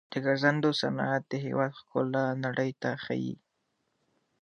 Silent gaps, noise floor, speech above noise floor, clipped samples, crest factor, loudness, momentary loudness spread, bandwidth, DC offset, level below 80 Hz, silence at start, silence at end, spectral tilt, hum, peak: none; -78 dBFS; 48 dB; under 0.1%; 22 dB; -30 LUFS; 8 LU; 10 kHz; under 0.1%; -76 dBFS; 0.1 s; 1.05 s; -6.5 dB/octave; none; -8 dBFS